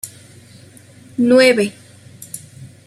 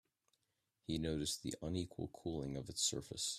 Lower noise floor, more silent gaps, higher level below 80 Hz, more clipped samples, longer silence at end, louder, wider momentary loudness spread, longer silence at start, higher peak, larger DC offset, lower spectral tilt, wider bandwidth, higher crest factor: second, -43 dBFS vs -86 dBFS; neither; about the same, -62 dBFS vs -62 dBFS; neither; first, 0.2 s vs 0 s; first, -14 LUFS vs -42 LUFS; first, 22 LU vs 8 LU; second, 0.05 s vs 0.9 s; first, -2 dBFS vs -24 dBFS; neither; about the same, -4 dB/octave vs -3.5 dB/octave; about the same, 15 kHz vs 15.5 kHz; about the same, 18 dB vs 20 dB